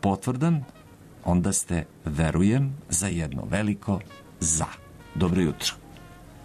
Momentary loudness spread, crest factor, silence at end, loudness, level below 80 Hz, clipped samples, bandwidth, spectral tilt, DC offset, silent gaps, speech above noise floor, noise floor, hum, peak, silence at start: 11 LU; 16 dB; 0 s; -26 LUFS; -44 dBFS; under 0.1%; 13.5 kHz; -5 dB/octave; under 0.1%; none; 21 dB; -46 dBFS; none; -10 dBFS; 0.05 s